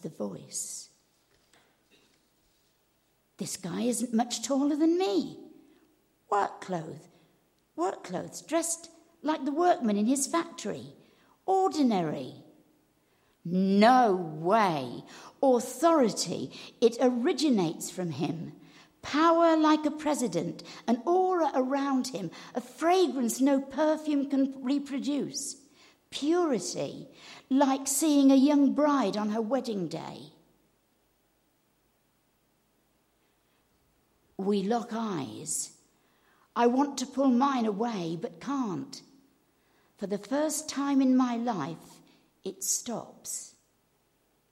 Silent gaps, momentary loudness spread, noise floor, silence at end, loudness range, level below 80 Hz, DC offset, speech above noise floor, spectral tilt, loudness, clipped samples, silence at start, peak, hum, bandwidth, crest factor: none; 16 LU; -71 dBFS; 1.05 s; 9 LU; -76 dBFS; under 0.1%; 43 dB; -4.5 dB/octave; -28 LUFS; under 0.1%; 0.05 s; -10 dBFS; none; 15.5 kHz; 20 dB